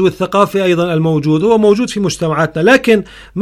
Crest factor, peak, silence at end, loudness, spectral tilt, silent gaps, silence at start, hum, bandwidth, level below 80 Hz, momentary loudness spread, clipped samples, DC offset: 12 dB; 0 dBFS; 0 s; -12 LUFS; -6 dB/octave; none; 0 s; none; 15 kHz; -44 dBFS; 5 LU; under 0.1%; under 0.1%